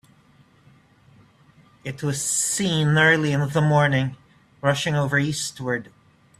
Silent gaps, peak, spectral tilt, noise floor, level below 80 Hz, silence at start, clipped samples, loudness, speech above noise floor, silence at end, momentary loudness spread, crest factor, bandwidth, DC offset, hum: none; -4 dBFS; -4.5 dB/octave; -56 dBFS; -58 dBFS; 1.85 s; under 0.1%; -21 LUFS; 35 dB; 0.55 s; 12 LU; 20 dB; 13.5 kHz; under 0.1%; none